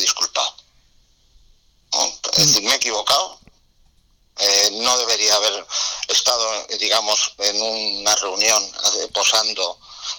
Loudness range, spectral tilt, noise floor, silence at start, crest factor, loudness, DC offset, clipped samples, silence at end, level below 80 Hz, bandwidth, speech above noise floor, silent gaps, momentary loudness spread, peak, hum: 2 LU; 0 dB/octave; -57 dBFS; 0 s; 14 dB; -17 LUFS; under 0.1%; under 0.1%; 0 s; -56 dBFS; 19 kHz; 38 dB; none; 8 LU; -6 dBFS; none